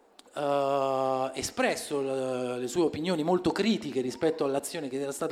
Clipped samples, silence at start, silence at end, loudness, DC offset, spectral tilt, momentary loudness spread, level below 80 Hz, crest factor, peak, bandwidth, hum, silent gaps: under 0.1%; 0.35 s; 0 s; -29 LUFS; under 0.1%; -4.5 dB/octave; 6 LU; -64 dBFS; 18 dB; -12 dBFS; 16 kHz; none; none